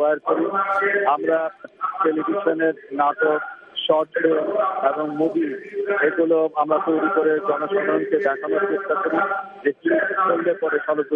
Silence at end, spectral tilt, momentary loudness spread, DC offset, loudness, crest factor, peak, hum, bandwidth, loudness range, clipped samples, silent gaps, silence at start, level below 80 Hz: 0 s; -7 dB/octave; 5 LU; under 0.1%; -21 LUFS; 16 dB; -4 dBFS; none; 3.9 kHz; 1 LU; under 0.1%; none; 0 s; -76 dBFS